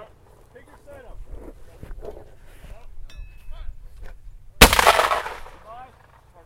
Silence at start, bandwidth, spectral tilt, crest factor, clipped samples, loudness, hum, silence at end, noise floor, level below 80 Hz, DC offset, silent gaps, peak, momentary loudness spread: 0 s; 16 kHz; -2.5 dB/octave; 24 dB; under 0.1%; -15 LUFS; none; 0.6 s; -51 dBFS; -32 dBFS; under 0.1%; none; 0 dBFS; 30 LU